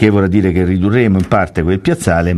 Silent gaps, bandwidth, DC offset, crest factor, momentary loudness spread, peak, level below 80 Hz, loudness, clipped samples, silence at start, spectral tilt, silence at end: none; 12.5 kHz; under 0.1%; 12 dB; 3 LU; 0 dBFS; -36 dBFS; -13 LUFS; under 0.1%; 0 s; -7.5 dB/octave; 0 s